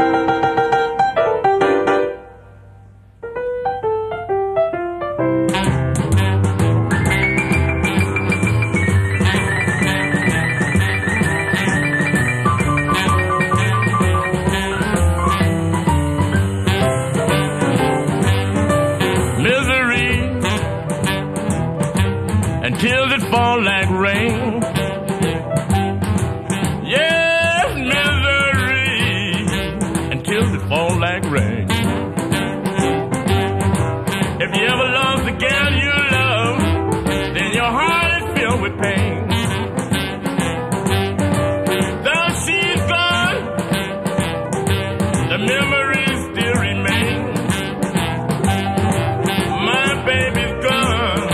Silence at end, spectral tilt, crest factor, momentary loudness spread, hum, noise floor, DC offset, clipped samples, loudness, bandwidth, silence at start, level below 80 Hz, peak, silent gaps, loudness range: 0 s; -5 dB/octave; 16 dB; 6 LU; none; -43 dBFS; under 0.1%; under 0.1%; -17 LUFS; 14.5 kHz; 0 s; -34 dBFS; -2 dBFS; none; 3 LU